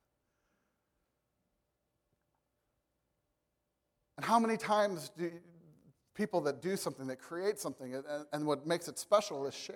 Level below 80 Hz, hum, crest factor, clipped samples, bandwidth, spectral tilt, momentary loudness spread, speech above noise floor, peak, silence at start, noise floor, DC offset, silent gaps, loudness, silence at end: -82 dBFS; none; 24 dB; under 0.1%; 18 kHz; -4.5 dB/octave; 11 LU; 49 dB; -14 dBFS; 4.2 s; -84 dBFS; under 0.1%; none; -35 LUFS; 0 s